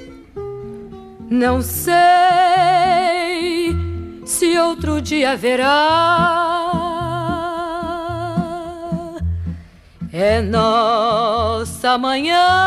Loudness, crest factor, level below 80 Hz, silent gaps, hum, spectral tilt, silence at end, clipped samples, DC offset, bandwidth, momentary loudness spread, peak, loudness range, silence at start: -17 LUFS; 14 dB; -36 dBFS; none; none; -4.5 dB/octave; 0 s; under 0.1%; under 0.1%; 15 kHz; 17 LU; -2 dBFS; 7 LU; 0 s